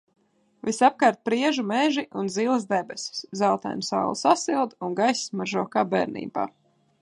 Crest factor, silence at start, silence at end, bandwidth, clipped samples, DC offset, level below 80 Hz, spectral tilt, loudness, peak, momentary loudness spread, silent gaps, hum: 20 dB; 0.65 s; 0.5 s; 11.5 kHz; under 0.1%; under 0.1%; -72 dBFS; -4 dB/octave; -25 LUFS; -4 dBFS; 9 LU; none; none